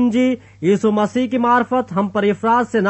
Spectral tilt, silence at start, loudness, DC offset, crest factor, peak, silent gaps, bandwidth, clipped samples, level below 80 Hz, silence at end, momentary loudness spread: -6.5 dB/octave; 0 s; -17 LUFS; under 0.1%; 12 dB; -4 dBFS; none; 8.4 kHz; under 0.1%; -58 dBFS; 0 s; 4 LU